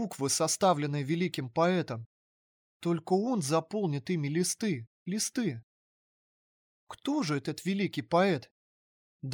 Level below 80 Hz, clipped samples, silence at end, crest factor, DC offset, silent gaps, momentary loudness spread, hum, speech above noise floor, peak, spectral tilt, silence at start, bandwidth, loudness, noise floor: -76 dBFS; under 0.1%; 0 s; 18 dB; under 0.1%; 2.06-2.80 s, 4.87-5.06 s, 5.63-6.87 s, 8.51-9.20 s; 11 LU; none; over 60 dB; -14 dBFS; -4.5 dB/octave; 0 s; over 20 kHz; -31 LUFS; under -90 dBFS